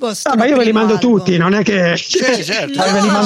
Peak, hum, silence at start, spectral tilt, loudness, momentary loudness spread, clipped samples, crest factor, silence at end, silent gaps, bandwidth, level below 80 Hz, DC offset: -2 dBFS; none; 0 s; -4.5 dB/octave; -13 LUFS; 3 LU; under 0.1%; 10 dB; 0 s; none; 15.5 kHz; -54 dBFS; under 0.1%